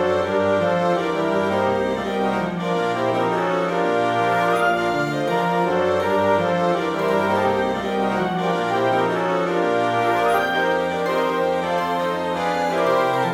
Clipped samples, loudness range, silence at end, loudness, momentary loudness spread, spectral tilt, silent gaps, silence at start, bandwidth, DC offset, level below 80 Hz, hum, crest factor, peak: under 0.1%; 1 LU; 0 s; -20 LUFS; 3 LU; -6 dB/octave; none; 0 s; 16.5 kHz; under 0.1%; -54 dBFS; none; 14 dB; -6 dBFS